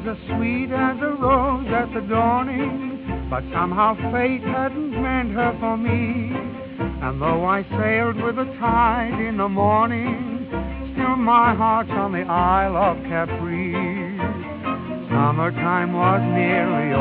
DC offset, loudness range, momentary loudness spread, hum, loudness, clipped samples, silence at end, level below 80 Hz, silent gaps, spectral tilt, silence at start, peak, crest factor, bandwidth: under 0.1%; 3 LU; 9 LU; none; -21 LUFS; under 0.1%; 0 s; -38 dBFS; none; -6 dB/octave; 0 s; -4 dBFS; 16 dB; 4.7 kHz